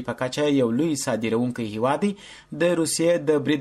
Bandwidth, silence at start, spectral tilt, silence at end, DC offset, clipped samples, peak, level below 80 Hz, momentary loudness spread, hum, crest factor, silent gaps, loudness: 13.5 kHz; 0 s; -5 dB/octave; 0 s; under 0.1%; under 0.1%; -8 dBFS; -60 dBFS; 7 LU; none; 14 dB; none; -23 LUFS